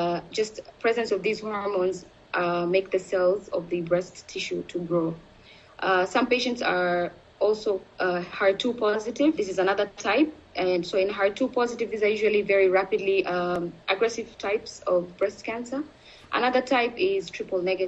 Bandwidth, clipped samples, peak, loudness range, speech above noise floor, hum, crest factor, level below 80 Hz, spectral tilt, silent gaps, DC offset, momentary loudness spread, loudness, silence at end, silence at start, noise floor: 8.4 kHz; under 0.1%; -8 dBFS; 3 LU; 26 dB; none; 18 dB; -62 dBFS; -5 dB/octave; none; under 0.1%; 8 LU; -26 LUFS; 0 s; 0 s; -52 dBFS